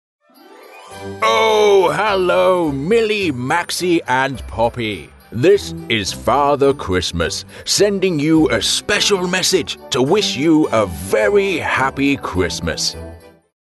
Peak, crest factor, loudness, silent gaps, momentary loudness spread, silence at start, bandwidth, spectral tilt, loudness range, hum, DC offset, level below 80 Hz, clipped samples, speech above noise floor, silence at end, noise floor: -2 dBFS; 14 dB; -16 LUFS; none; 7 LU; 0.7 s; 12.5 kHz; -4 dB/octave; 2 LU; none; under 0.1%; -40 dBFS; under 0.1%; 27 dB; 0.5 s; -43 dBFS